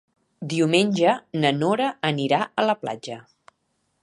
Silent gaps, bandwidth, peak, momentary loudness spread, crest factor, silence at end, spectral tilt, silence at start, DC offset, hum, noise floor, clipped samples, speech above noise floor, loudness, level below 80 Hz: none; 11.5 kHz; -4 dBFS; 15 LU; 20 dB; 0.8 s; -5.5 dB/octave; 0.4 s; under 0.1%; none; -72 dBFS; under 0.1%; 50 dB; -22 LUFS; -70 dBFS